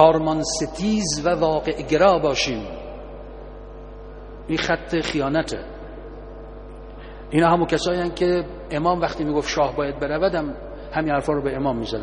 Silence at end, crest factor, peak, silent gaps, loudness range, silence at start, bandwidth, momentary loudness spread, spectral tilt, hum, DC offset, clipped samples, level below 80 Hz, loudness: 0 s; 22 dB; 0 dBFS; none; 5 LU; 0 s; 10.5 kHz; 21 LU; -5 dB/octave; none; under 0.1%; under 0.1%; -40 dBFS; -22 LUFS